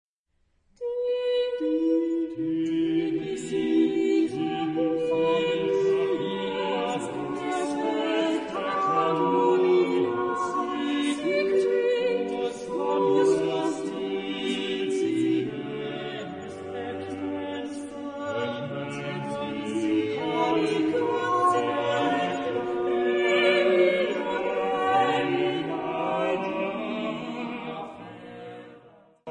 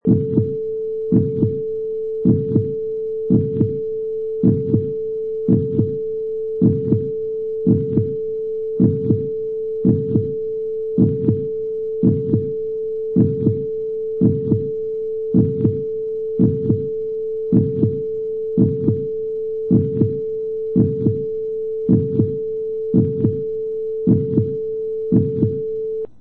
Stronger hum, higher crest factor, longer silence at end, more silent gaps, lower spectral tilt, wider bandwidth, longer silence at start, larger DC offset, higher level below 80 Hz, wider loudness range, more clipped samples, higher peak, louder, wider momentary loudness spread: neither; about the same, 16 dB vs 16 dB; about the same, 0 s vs 0 s; neither; second, -5.5 dB/octave vs -14 dB/octave; first, 10.5 kHz vs 1.8 kHz; first, 0.8 s vs 0.05 s; neither; second, -66 dBFS vs -50 dBFS; first, 7 LU vs 1 LU; neither; second, -10 dBFS vs -4 dBFS; second, -26 LUFS vs -20 LUFS; first, 11 LU vs 7 LU